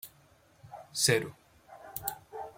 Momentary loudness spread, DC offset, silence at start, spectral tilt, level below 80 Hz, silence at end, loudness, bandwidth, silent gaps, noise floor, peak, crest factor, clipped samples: 24 LU; under 0.1%; 0.05 s; -2.5 dB/octave; -68 dBFS; 0.05 s; -31 LUFS; 16.5 kHz; none; -63 dBFS; -12 dBFS; 24 dB; under 0.1%